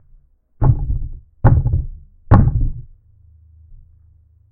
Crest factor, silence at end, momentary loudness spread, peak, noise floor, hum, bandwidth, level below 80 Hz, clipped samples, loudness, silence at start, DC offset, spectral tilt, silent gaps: 18 dB; 0.75 s; 18 LU; 0 dBFS; -51 dBFS; none; 2.7 kHz; -22 dBFS; under 0.1%; -17 LUFS; 0.6 s; under 0.1%; -12.5 dB/octave; none